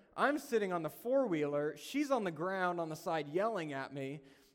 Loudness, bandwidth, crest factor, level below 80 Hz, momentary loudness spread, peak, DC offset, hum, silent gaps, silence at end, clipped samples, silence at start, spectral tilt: -36 LUFS; 17.5 kHz; 18 dB; -80 dBFS; 8 LU; -18 dBFS; under 0.1%; none; none; 0.25 s; under 0.1%; 0.15 s; -5.5 dB/octave